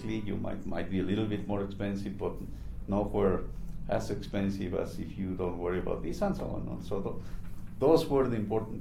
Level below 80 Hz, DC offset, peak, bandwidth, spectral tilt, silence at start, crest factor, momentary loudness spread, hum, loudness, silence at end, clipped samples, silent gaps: -44 dBFS; under 0.1%; -12 dBFS; 15 kHz; -7.5 dB/octave; 0 s; 20 dB; 13 LU; none; -33 LUFS; 0 s; under 0.1%; none